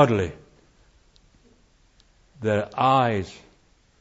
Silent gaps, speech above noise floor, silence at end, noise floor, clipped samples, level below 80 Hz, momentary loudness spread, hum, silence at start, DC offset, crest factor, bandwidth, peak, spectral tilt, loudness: none; 38 dB; 0.65 s; -60 dBFS; under 0.1%; -56 dBFS; 12 LU; none; 0 s; under 0.1%; 24 dB; 8 kHz; -2 dBFS; -7 dB/octave; -23 LUFS